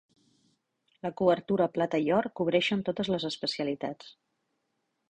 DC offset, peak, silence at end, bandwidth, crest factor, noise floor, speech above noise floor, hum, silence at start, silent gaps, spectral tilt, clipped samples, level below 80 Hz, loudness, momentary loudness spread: under 0.1%; -10 dBFS; 1 s; 9.6 kHz; 20 dB; -80 dBFS; 51 dB; none; 1.05 s; none; -6 dB/octave; under 0.1%; -68 dBFS; -29 LUFS; 11 LU